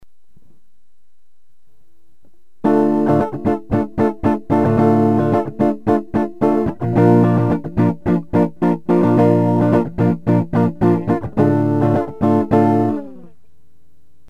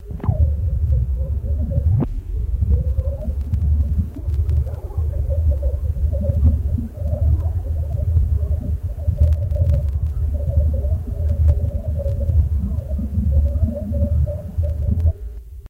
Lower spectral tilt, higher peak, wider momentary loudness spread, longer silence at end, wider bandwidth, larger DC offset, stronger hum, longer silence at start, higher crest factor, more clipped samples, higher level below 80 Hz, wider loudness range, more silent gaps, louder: about the same, -10 dB/octave vs -10.5 dB/octave; about the same, -2 dBFS vs -4 dBFS; about the same, 6 LU vs 6 LU; first, 1.1 s vs 0 s; first, 7.8 kHz vs 1.8 kHz; first, 2% vs under 0.1%; neither; about the same, 0 s vs 0 s; about the same, 16 dB vs 14 dB; neither; second, -44 dBFS vs -20 dBFS; first, 4 LU vs 1 LU; neither; first, -16 LUFS vs -21 LUFS